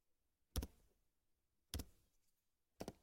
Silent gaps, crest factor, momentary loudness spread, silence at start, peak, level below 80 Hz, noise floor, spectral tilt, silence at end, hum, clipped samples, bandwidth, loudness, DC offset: none; 30 dB; 7 LU; 0.55 s; -26 dBFS; -58 dBFS; -85 dBFS; -4.5 dB/octave; 0.1 s; none; under 0.1%; 16.5 kHz; -53 LUFS; under 0.1%